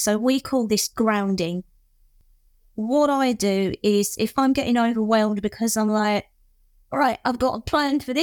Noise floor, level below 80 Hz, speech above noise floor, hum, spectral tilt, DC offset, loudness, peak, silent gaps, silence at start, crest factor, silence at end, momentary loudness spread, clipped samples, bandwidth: -58 dBFS; -52 dBFS; 37 dB; none; -4.5 dB/octave; under 0.1%; -22 LUFS; -6 dBFS; none; 0 s; 16 dB; 0 s; 5 LU; under 0.1%; 19.5 kHz